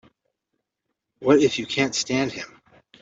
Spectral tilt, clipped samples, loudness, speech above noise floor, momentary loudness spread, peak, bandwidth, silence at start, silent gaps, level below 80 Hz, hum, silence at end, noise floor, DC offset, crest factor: -4 dB/octave; under 0.1%; -22 LUFS; 59 dB; 14 LU; -4 dBFS; 8 kHz; 1.2 s; none; -64 dBFS; none; 0.55 s; -81 dBFS; under 0.1%; 22 dB